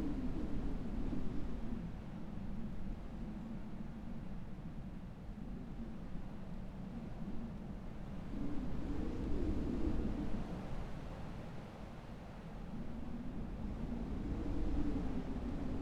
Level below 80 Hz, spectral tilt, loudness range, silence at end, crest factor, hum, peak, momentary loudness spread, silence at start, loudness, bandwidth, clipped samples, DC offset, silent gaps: -44 dBFS; -8.5 dB/octave; 6 LU; 0 s; 16 dB; none; -24 dBFS; 9 LU; 0 s; -45 LUFS; 8 kHz; under 0.1%; under 0.1%; none